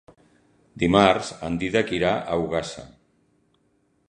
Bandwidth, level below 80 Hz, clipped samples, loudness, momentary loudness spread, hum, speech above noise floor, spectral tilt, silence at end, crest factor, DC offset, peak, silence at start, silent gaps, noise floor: 10 kHz; -48 dBFS; under 0.1%; -22 LUFS; 11 LU; none; 44 dB; -5.5 dB/octave; 1.2 s; 24 dB; under 0.1%; -2 dBFS; 0.75 s; none; -67 dBFS